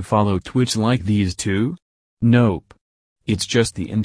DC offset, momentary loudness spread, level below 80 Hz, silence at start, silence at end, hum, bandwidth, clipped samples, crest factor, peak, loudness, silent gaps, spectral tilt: under 0.1%; 9 LU; -46 dBFS; 0 s; 0 s; none; 11 kHz; under 0.1%; 16 dB; -2 dBFS; -20 LUFS; 1.82-2.17 s, 2.81-3.16 s; -6 dB/octave